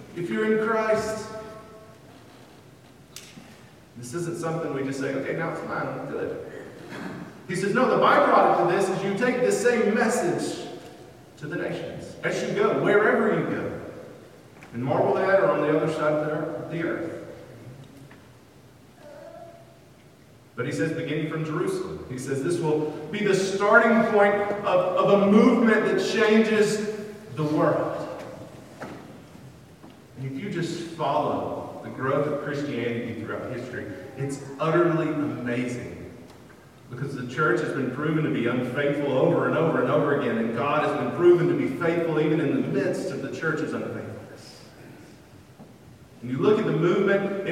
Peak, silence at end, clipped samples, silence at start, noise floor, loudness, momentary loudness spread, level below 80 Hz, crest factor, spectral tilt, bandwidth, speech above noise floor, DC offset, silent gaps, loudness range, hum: -4 dBFS; 0 s; under 0.1%; 0 s; -52 dBFS; -24 LUFS; 21 LU; -64 dBFS; 22 dB; -6 dB/octave; 15.5 kHz; 28 dB; under 0.1%; none; 12 LU; none